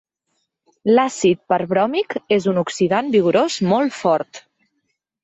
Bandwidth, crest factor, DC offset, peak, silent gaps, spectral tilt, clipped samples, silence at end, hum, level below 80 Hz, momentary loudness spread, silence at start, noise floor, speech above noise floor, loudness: 8.2 kHz; 16 dB; under 0.1%; -4 dBFS; none; -5.5 dB/octave; under 0.1%; 0.85 s; none; -64 dBFS; 5 LU; 0.85 s; -73 dBFS; 55 dB; -18 LUFS